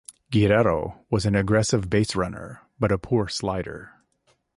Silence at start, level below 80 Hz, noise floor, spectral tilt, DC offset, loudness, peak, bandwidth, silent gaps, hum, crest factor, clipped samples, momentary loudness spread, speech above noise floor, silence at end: 0.3 s; -44 dBFS; -67 dBFS; -6 dB/octave; under 0.1%; -23 LUFS; -8 dBFS; 11.5 kHz; none; none; 16 dB; under 0.1%; 13 LU; 44 dB; 0.7 s